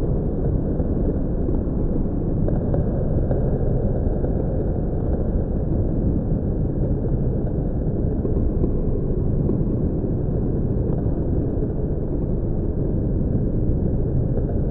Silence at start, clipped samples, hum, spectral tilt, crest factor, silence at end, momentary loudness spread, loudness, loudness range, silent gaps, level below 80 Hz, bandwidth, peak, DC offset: 0 s; under 0.1%; none; -14.5 dB/octave; 14 dB; 0 s; 2 LU; -23 LUFS; 1 LU; none; -24 dBFS; 1.9 kHz; -8 dBFS; under 0.1%